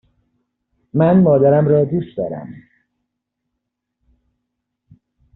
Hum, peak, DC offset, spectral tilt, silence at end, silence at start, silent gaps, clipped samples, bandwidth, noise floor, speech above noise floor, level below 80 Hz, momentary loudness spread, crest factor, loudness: none; -2 dBFS; under 0.1%; -10 dB/octave; 2.85 s; 0.95 s; none; under 0.1%; 4.1 kHz; -78 dBFS; 63 dB; -54 dBFS; 15 LU; 16 dB; -15 LUFS